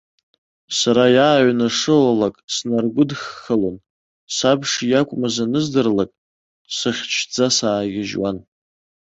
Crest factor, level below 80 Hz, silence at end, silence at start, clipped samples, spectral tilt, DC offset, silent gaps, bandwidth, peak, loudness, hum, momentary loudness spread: 18 dB; -56 dBFS; 0.65 s; 0.7 s; under 0.1%; -4 dB/octave; under 0.1%; 2.44-2.48 s, 3.90-4.27 s, 6.18-6.65 s; 8.2 kHz; -2 dBFS; -18 LUFS; none; 10 LU